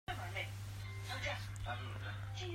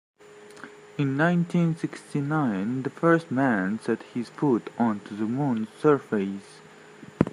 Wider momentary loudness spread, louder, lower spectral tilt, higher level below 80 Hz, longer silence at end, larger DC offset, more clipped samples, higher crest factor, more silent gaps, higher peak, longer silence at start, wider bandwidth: second, 5 LU vs 10 LU; second, -44 LUFS vs -26 LUFS; second, -4.5 dB/octave vs -8 dB/octave; first, -56 dBFS vs -64 dBFS; about the same, 0 s vs 0 s; neither; neither; second, 16 dB vs 22 dB; neither; second, -28 dBFS vs -4 dBFS; second, 0.1 s vs 0.35 s; first, 16 kHz vs 11 kHz